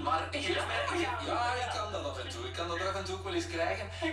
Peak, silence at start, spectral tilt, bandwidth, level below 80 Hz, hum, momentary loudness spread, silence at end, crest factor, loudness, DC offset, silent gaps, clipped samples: -20 dBFS; 0 s; -4 dB/octave; 13.5 kHz; -54 dBFS; none; 6 LU; 0 s; 14 dB; -34 LUFS; under 0.1%; none; under 0.1%